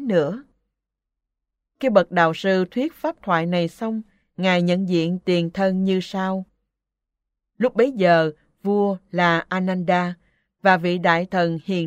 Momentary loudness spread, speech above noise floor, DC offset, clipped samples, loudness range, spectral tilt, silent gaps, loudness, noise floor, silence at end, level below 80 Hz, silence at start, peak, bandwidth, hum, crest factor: 10 LU; 63 dB; under 0.1%; under 0.1%; 2 LU; -7 dB/octave; none; -21 LUFS; -83 dBFS; 0 s; -62 dBFS; 0 s; -2 dBFS; 9 kHz; none; 20 dB